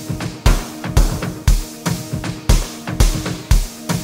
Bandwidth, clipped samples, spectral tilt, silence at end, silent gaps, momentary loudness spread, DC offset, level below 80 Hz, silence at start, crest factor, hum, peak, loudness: 16.5 kHz; under 0.1%; -4.5 dB/octave; 0 s; none; 5 LU; under 0.1%; -18 dBFS; 0 s; 16 dB; none; 0 dBFS; -20 LUFS